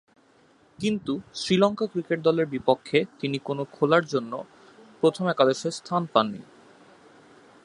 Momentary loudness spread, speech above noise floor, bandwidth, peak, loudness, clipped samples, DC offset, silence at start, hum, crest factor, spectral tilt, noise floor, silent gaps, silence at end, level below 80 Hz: 9 LU; 35 dB; 11 kHz; -4 dBFS; -25 LUFS; under 0.1%; under 0.1%; 0.8 s; none; 24 dB; -5.5 dB/octave; -59 dBFS; none; 1.2 s; -66 dBFS